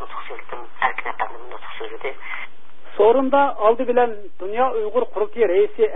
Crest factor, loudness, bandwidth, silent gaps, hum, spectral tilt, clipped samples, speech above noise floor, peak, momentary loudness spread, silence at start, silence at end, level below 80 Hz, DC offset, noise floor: 18 dB; -20 LUFS; 3.9 kHz; none; none; -9.5 dB/octave; under 0.1%; 28 dB; -4 dBFS; 17 LU; 0 s; 0 s; -62 dBFS; 6%; -48 dBFS